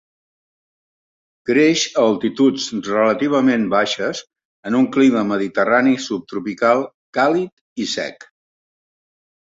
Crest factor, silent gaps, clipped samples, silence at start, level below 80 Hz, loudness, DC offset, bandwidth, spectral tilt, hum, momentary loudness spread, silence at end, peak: 18 dB; 4.45-4.63 s, 6.94-7.13 s, 7.52-7.76 s; under 0.1%; 1.45 s; -62 dBFS; -18 LUFS; under 0.1%; 7.8 kHz; -4.5 dB/octave; none; 11 LU; 1.35 s; -2 dBFS